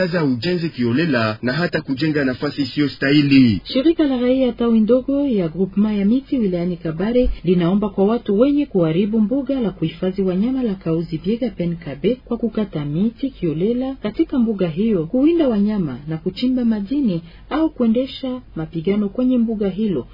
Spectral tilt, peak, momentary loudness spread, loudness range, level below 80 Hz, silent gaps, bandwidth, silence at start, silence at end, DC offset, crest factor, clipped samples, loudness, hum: -9 dB/octave; -2 dBFS; 7 LU; 5 LU; -40 dBFS; none; 5.4 kHz; 0 s; 0 s; under 0.1%; 16 dB; under 0.1%; -19 LUFS; none